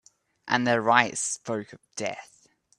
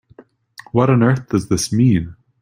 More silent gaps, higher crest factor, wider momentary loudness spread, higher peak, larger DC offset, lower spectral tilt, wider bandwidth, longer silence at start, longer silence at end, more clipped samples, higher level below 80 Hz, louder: neither; first, 26 dB vs 16 dB; first, 19 LU vs 7 LU; about the same, -2 dBFS vs -2 dBFS; neither; second, -3 dB/octave vs -6.5 dB/octave; second, 12 kHz vs 15.5 kHz; second, 0.45 s vs 0.75 s; first, 0.55 s vs 0.3 s; neither; second, -72 dBFS vs -46 dBFS; second, -26 LUFS vs -17 LUFS